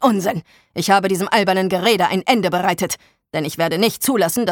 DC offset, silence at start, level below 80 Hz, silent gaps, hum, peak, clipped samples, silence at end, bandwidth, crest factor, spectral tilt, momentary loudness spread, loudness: under 0.1%; 0 s; -58 dBFS; none; none; -2 dBFS; under 0.1%; 0 s; 19 kHz; 16 dB; -4 dB/octave; 9 LU; -18 LUFS